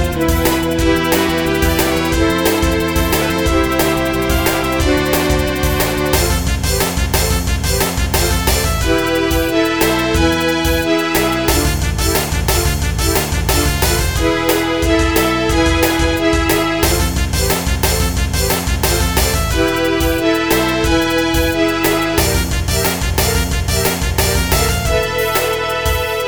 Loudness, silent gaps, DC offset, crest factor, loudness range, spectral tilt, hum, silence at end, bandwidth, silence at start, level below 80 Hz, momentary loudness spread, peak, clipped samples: -15 LUFS; none; 0.7%; 14 dB; 1 LU; -4 dB/octave; none; 0 s; over 20 kHz; 0 s; -22 dBFS; 2 LU; 0 dBFS; under 0.1%